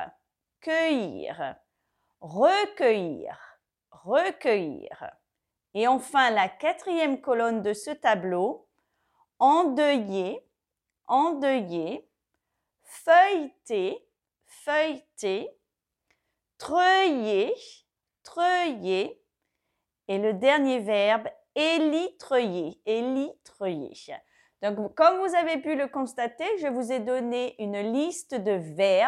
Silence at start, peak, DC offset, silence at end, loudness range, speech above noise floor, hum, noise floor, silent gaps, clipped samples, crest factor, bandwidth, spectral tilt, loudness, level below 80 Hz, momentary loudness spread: 0 s; -6 dBFS; under 0.1%; 0 s; 3 LU; 61 dB; none; -86 dBFS; none; under 0.1%; 20 dB; 13 kHz; -4.5 dB/octave; -26 LUFS; -76 dBFS; 15 LU